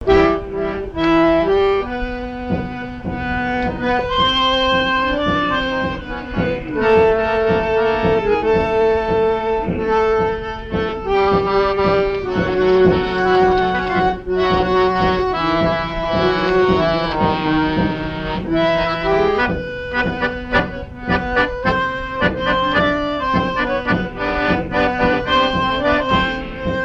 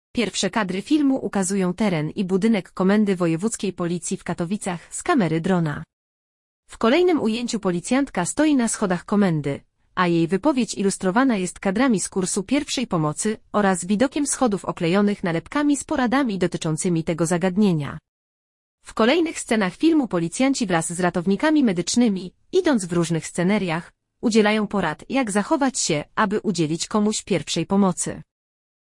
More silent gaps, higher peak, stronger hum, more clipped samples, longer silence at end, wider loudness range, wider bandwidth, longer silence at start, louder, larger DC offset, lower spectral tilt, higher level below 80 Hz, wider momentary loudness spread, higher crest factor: second, none vs 5.93-6.63 s, 18.08-18.78 s; about the same, -2 dBFS vs -4 dBFS; neither; neither; second, 0 s vs 0.8 s; about the same, 3 LU vs 2 LU; second, 7.6 kHz vs 12 kHz; second, 0 s vs 0.15 s; first, -17 LUFS vs -22 LUFS; neither; first, -6.5 dB/octave vs -5 dB/octave; first, -32 dBFS vs -54 dBFS; about the same, 8 LU vs 7 LU; about the same, 16 dB vs 18 dB